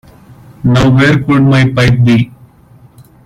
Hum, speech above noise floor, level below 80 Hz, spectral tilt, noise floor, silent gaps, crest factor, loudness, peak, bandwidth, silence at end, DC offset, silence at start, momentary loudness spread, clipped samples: none; 33 dB; -34 dBFS; -7 dB/octave; -41 dBFS; none; 10 dB; -9 LUFS; 0 dBFS; 11 kHz; 0.95 s; under 0.1%; 0.65 s; 5 LU; under 0.1%